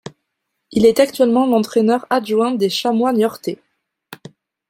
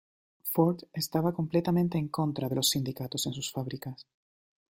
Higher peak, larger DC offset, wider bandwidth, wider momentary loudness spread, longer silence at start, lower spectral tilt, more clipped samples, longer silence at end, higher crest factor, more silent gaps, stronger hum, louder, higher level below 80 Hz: first, 0 dBFS vs -10 dBFS; neither; about the same, 16.5 kHz vs 16.5 kHz; about the same, 10 LU vs 11 LU; second, 0.05 s vs 0.45 s; about the same, -5 dB/octave vs -5 dB/octave; neither; second, 0.55 s vs 0.75 s; about the same, 16 dB vs 20 dB; neither; neither; first, -16 LUFS vs -30 LUFS; first, -56 dBFS vs -66 dBFS